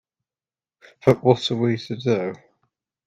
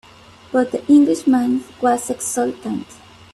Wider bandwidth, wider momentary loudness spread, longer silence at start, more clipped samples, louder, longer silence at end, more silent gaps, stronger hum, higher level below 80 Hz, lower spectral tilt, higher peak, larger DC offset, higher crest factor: second, 9.4 kHz vs 13.5 kHz; second, 7 LU vs 11 LU; first, 1.05 s vs 0.5 s; neither; second, -21 LUFS vs -18 LUFS; first, 0.7 s vs 0.5 s; neither; neither; about the same, -60 dBFS vs -58 dBFS; first, -7 dB/octave vs -4.5 dB/octave; about the same, -2 dBFS vs -4 dBFS; neither; first, 22 dB vs 16 dB